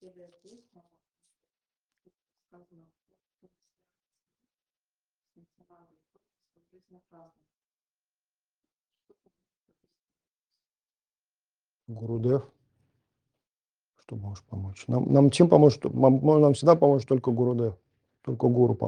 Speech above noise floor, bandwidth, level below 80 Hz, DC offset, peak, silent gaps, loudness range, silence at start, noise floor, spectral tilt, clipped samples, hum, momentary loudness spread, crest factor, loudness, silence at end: over 66 dB; 10 kHz; -68 dBFS; under 0.1%; -4 dBFS; 13.49-13.69 s; 15 LU; 11.9 s; under -90 dBFS; -8 dB/octave; under 0.1%; 50 Hz at -70 dBFS; 20 LU; 24 dB; -22 LUFS; 0 s